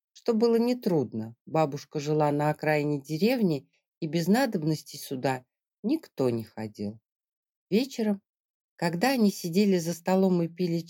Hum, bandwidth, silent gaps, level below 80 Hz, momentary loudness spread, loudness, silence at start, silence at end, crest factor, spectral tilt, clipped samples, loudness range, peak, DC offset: none; 17 kHz; 1.41-1.45 s, 3.88-4.01 s, 5.79-5.83 s, 7.12-7.16 s, 7.29-7.43 s, 7.49-7.67 s, 8.29-8.76 s; -78 dBFS; 12 LU; -28 LUFS; 0.15 s; 0 s; 16 dB; -6.5 dB/octave; under 0.1%; 5 LU; -12 dBFS; under 0.1%